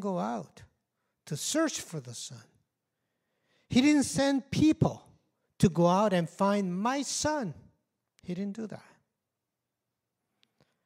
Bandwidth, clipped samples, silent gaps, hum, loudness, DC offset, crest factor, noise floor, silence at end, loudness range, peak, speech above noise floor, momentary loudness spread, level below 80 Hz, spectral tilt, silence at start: 16 kHz; under 0.1%; none; none; -28 LUFS; under 0.1%; 22 dB; -87 dBFS; 2.05 s; 10 LU; -10 dBFS; 58 dB; 16 LU; -60 dBFS; -5 dB/octave; 0 s